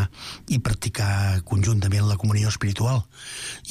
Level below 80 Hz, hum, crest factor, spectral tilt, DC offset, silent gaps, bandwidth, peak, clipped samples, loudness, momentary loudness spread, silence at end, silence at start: -42 dBFS; none; 10 dB; -5 dB/octave; under 0.1%; none; 14.5 kHz; -14 dBFS; under 0.1%; -24 LUFS; 11 LU; 0 s; 0 s